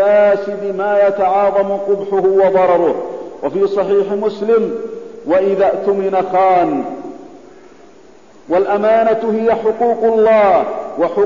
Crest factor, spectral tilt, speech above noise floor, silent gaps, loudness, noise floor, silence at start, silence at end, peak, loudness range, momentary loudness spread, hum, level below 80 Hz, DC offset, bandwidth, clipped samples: 12 dB; -7.5 dB/octave; 30 dB; none; -14 LUFS; -43 dBFS; 0 s; 0 s; -2 dBFS; 3 LU; 10 LU; none; -54 dBFS; 0.5%; 7.4 kHz; under 0.1%